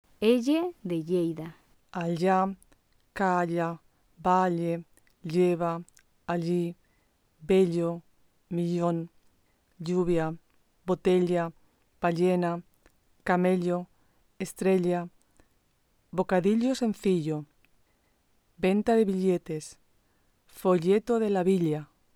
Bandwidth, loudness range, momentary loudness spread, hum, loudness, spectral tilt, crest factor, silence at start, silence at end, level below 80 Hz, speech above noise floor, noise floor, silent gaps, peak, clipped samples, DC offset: 15 kHz; 2 LU; 14 LU; none; -28 LUFS; -7 dB/octave; 16 dB; 0.2 s; 0.3 s; -60 dBFS; 43 dB; -69 dBFS; none; -12 dBFS; under 0.1%; under 0.1%